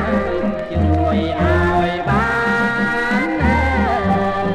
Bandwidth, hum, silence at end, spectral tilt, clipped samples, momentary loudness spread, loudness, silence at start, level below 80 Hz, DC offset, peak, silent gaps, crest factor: 10.5 kHz; none; 0 s; -7.5 dB/octave; under 0.1%; 3 LU; -17 LUFS; 0 s; -28 dBFS; under 0.1%; -4 dBFS; none; 12 dB